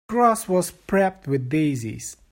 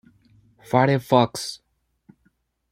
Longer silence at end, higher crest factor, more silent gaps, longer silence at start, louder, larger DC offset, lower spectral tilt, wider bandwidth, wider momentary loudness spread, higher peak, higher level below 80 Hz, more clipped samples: second, 0.15 s vs 1.15 s; second, 16 dB vs 22 dB; neither; second, 0.1 s vs 0.7 s; about the same, -23 LUFS vs -21 LUFS; neither; about the same, -6 dB/octave vs -6 dB/octave; about the same, 16.5 kHz vs 16 kHz; second, 10 LU vs 14 LU; second, -6 dBFS vs -2 dBFS; first, -54 dBFS vs -62 dBFS; neither